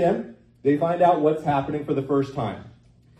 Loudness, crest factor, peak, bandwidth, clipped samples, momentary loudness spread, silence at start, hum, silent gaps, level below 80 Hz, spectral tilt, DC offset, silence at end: -23 LUFS; 18 dB; -6 dBFS; 8.8 kHz; under 0.1%; 12 LU; 0 s; none; none; -56 dBFS; -8.5 dB/octave; under 0.1%; 0.5 s